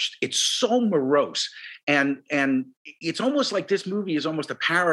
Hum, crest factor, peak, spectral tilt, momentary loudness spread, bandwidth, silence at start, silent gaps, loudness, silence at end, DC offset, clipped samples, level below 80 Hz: none; 16 dB; -8 dBFS; -3 dB/octave; 8 LU; 12.5 kHz; 0 s; 1.83-1.87 s, 2.77-2.85 s; -24 LUFS; 0 s; under 0.1%; under 0.1%; -80 dBFS